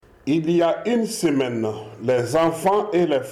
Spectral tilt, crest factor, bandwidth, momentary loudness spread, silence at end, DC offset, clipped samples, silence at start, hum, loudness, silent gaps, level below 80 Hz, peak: -5.5 dB/octave; 10 dB; 15.5 kHz; 5 LU; 0 s; under 0.1%; under 0.1%; 0.25 s; none; -21 LUFS; none; -60 dBFS; -10 dBFS